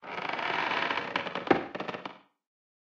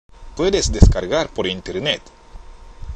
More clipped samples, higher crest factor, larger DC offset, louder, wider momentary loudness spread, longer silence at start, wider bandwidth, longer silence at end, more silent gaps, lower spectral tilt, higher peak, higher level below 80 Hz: second, under 0.1% vs 0.2%; first, 26 dB vs 18 dB; neither; second, -31 LUFS vs -19 LUFS; about the same, 10 LU vs 10 LU; second, 0 s vs 0.2 s; second, 8.6 kHz vs 9.8 kHz; first, 0.7 s vs 0 s; neither; about the same, -5 dB/octave vs -5 dB/octave; second, -8 dBFS vs 0 dBFS; second, -72 dBFS vs -22 dBFS